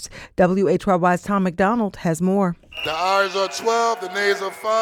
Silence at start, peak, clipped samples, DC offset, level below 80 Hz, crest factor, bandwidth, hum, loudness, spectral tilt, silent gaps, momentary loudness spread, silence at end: 0 s; -4 dBFS; under 0.1%; under 0.1%; -50 dBFS; 16 dB; 16.5 kHz; none; -20 LUFS; -5.5 dB/octave; none; 5 LU; 0 s